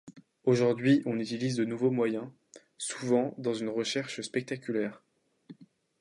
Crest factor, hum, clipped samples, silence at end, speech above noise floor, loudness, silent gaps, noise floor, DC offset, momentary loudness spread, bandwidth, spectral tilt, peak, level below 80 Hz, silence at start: 18 dB; none; under 0.1%; 0.35 s; 25 dB; -30 LUFS; none; -54 dBFS; under 0.1%; 10 LU; 11.5 kHz; -5.5 dB/octave; -12 dBFS; -78 dBFS; 0.05 s